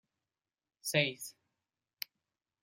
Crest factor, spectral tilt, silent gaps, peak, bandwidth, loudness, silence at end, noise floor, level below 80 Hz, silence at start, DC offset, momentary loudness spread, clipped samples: 26 dB; -3 dB/octave; none; -16 dBFS; 16 kHz; -35 LUFS; 1.3 s; under -90 dBFS; -80 dBFS; 0.85 s; under 0.1%; 16 LU; under 0.1%